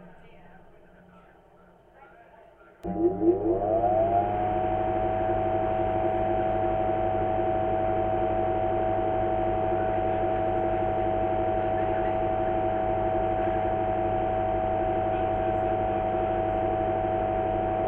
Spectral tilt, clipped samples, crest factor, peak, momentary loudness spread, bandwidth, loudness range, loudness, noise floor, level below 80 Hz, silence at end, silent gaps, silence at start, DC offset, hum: -10 dB/octave; under 0.1%; 16 dB; -12 dBFS; 2 LU; 3.8 kHz; 2 LU; -26 LUFS; -56 dBFS; -42 dBFS; 0 s; none; 0 s; under 0.1%; none